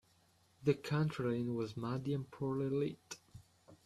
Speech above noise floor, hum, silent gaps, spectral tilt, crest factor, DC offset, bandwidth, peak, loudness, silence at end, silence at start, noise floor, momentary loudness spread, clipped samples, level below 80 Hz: 34 dB; none; none; -7 dB/octave; 20 dB; under 0.1%; 13 kHz; -20 dBFS; -38 LUFS; 0.1 s; 0.6 s; -71 dBFS; 8 LU; under 0.1%; -70 dBFS